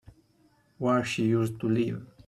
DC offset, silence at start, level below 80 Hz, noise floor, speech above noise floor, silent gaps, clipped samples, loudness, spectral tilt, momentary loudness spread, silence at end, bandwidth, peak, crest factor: under 0.1%; 0.8 s; -62 dBFS; -65 dBFS; 38 dB; none; under 0.1%; -28 LUFS; -6.5 dB/octave; 5 LU; 0.2 s; 13.5 kHz; -14 dBFS; 14 dB